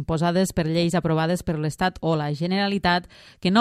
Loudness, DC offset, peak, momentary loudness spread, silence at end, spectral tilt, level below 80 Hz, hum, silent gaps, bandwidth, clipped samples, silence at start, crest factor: -23 LUFS; under 0.1%; -4 dBFS; 4 LU; 0 s; -6 dB/octave; -46 dBFS; none; none; 14.5 kHz; under 0.1%; 0 s; 18 dB